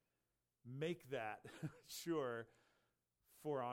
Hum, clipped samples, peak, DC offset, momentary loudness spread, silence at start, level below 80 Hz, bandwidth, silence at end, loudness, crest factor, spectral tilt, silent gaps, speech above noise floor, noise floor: none; under 0.1%; -32 dBFS; under 0.1%; 11 LU; 0.65 s; -86 dBFS; 17.5 kHz; 0 s; -48 LUFS; 16 dB; -5.5 dB/octave; none; 44 dB; -90 dBFS